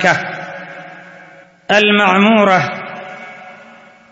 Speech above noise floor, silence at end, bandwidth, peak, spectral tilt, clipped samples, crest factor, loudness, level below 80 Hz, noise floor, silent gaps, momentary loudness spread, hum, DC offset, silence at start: 30 dB; 0.55 s; 7.8 kHz; 0 dBFS; -5 dB/octave; under 0.1%; 16 dB; -12 LUFS; -60 dBFS; -42 dBFS; none; 23 LU; none; under 0.1%; 0 s